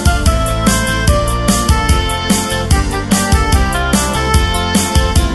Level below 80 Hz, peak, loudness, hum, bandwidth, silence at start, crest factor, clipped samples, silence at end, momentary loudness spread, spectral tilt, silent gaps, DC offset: -16 dBFS; 0 dBFS; -13 LUFS; none; 12.5 kHz; 0 s; 12 dB; under 0.1%; 0 s; 2 LU; -4 dB/octave; none; under 0.1%